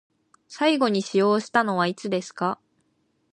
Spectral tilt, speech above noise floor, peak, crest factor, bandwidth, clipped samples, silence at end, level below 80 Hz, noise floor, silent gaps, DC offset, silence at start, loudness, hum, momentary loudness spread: -5 dB/octave; 47 dB; -6 dBFS; 20 dB; 10.5 kHz; under 0.1%; 0.8 s; -74 dBFS; -70 dBFS; none; under 0.1%; 0.5 s; -23 LUFS; none; 8 LU